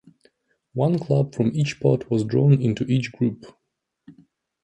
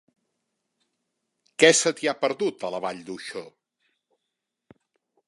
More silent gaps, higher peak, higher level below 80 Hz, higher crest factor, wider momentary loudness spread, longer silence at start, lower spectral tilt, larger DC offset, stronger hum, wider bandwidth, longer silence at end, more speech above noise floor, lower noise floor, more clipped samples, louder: neither; second, -6 dBFS vs 0 dBFS; first, -58 dBFS vs -78 dBFS; second, 18 dB vs 26 dB; second, 8 LU vs 19 LU; second, 0.75 s vs 1.6 s; first, -8 dB/octave vs -2 dB/octave; neither; neither; second, 8.6 kHz vs 11.5 kHz; second, 0.5 s vs 1.8 s; second, 42 dB vs 59 dB; second, -63 dBFS vs -83 dBFS; neither; about the same, -22 LUFS vs -22 LUFS